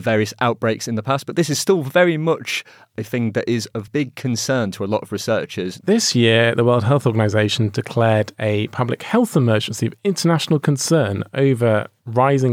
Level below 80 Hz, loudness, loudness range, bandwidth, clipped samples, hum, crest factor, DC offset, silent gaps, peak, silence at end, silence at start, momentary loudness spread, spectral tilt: -68 dBFS; -19 LUFS; 4 LU; 16 kHz; under 0.1%; none; 16 dB; under 0.1%; none; -2 dBFS; 0 s; 0 s; 8 LU; -5.5 dB/octave